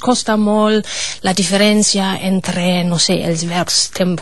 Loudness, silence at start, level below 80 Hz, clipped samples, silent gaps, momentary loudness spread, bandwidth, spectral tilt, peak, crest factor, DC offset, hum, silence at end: -14 LUFS; 0 s; -48 dBFS; under 0.1%; none; 6 LU; 12.5 kHz; -4 dB/octave; 0 dBFS; 14 dB; 2%; none; 0 s